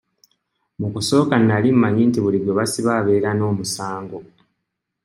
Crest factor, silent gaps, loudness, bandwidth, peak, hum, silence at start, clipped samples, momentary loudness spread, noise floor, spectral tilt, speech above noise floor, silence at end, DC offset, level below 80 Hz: 18 dB; none; -18 LUFS; 16 kHz; -2 dBFS; none; 0.8 s; under 0.1%; 13 LU; -78 dBFS; -6 dB/octave; 60 dB; 0.85 s; under 0.1%; -62 dBFS